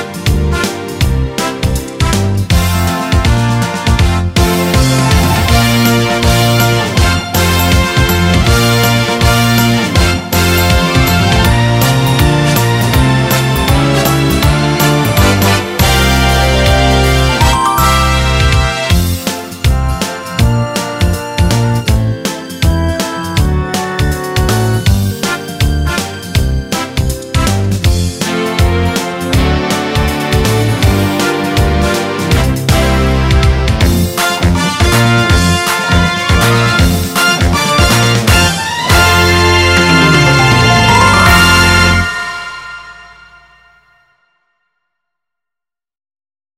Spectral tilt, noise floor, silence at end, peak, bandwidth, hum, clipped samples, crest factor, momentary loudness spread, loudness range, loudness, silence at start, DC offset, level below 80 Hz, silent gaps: -4.5 dB/octave; -86 dBFS; 3.5 s; 0 dBFS; 16.5 kHz; none; under 0.1%; 10 dB; 8 LU; 6 LU; -11 LUFS; 0 s; 0.2%; -18 dBFS; none